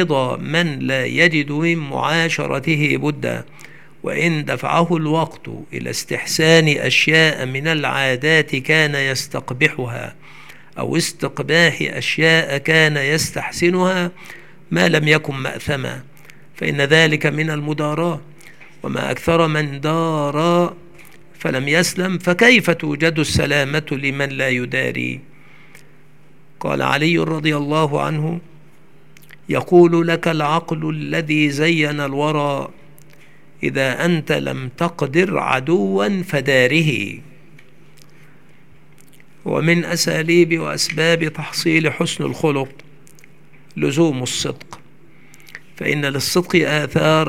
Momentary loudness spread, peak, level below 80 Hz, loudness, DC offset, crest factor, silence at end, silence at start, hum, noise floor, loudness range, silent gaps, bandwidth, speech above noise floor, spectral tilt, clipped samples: 12 LU; 0 dBFS; -54 dBFS; -17 LUFS; 0.9%; 18 dB; 0 s; 0 s; none; -50 dBFS; 5 LU; none; 16.5 kHz; 33 dB; -4.5 dB/octave; under 0.1%